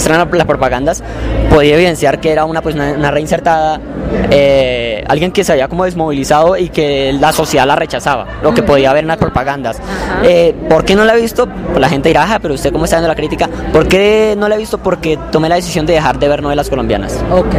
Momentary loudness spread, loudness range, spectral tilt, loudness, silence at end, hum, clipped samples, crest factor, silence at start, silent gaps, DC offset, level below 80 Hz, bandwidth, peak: 7 LU; 1 LU; -5 dB/octave; -11 LUFS; 0 s; none; under 0.1%; 10 dB; 0 s; none; under 0.1%; -26 dBFS; 16 kHz; 0 dBFS